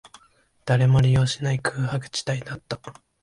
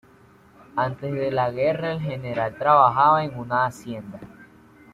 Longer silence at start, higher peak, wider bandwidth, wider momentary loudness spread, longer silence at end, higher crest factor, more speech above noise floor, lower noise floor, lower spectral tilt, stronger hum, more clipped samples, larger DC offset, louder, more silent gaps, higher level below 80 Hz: about the same, 0.65 s vs 0.75 s; second, -10 dBFS vs -4 dBFS; second, 11.5 kHz vs 13.5 kHz; second, 16 LU vs 19 LU; second, 0.3 s vs 0.5 s; second, 14 dB vs 20 dB; first, 38 dB vs 31 dB; first, -60 dBFS vs -53 dBFS; about the same, -6 dB/octave vs -7 dB/octave; neither; neither; neither; about the same, -23 LUFS vs -22 LUFS; neither; first, -48 dBFS vs -58 dBFS